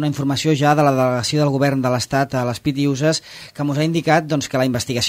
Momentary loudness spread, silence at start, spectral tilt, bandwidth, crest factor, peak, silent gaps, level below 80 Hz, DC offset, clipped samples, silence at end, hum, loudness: 6 LU; 0 s; -5.5 dB/octave; 16 kHz; 16 dB; -2 dBFS; none; -52 dBFS; under 0.1%; under 0.1%; 0 s; none; -18 LUFS